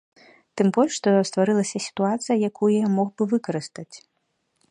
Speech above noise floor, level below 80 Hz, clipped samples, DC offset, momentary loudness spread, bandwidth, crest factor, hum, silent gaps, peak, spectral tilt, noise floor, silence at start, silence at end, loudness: 51 dB; -72 dBFS; under 0.1%; under 0.1%; 13 LU; 10.5 kHz; 18 dB; none; none; -6 dBFS; -5.5 dB/octave; -73 dBFS; 0.55 s; 0.75 s; -22 LUFS